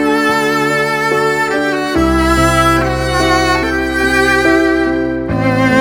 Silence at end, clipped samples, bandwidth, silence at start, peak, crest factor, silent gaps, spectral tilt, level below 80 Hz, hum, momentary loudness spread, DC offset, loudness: 0 s; under 0.1%; 19.5 kHz; 0 s; 0 dBFS; 12 dB; none; -5 dB/octave; -26 dBFS; none; 4 LU; under 0.1%; -12 LUFS